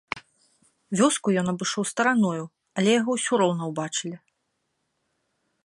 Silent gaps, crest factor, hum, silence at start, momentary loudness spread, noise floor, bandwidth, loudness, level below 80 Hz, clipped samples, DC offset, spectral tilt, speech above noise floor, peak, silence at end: none; 20 dB; none; 0.15 s; 13 LU; -76 dBFS; 11.5 kHz; -24 LUFS; -72 dBFS; under 0.1%; under 0.1%; -4 dB/octave; 53 dB; -6 dBFS; 1.45 s